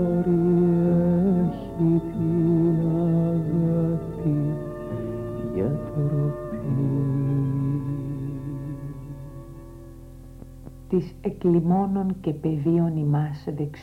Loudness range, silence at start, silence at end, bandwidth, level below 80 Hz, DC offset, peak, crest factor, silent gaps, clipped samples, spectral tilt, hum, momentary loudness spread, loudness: 10 LU; 0 s; 0 s; 4.3 kHz; -46 dBFS; under 0.1%; -10 dBFS; 14 dB; none; under 0.1%; -11 dB/octave; none; 19 LU; -24 LUFS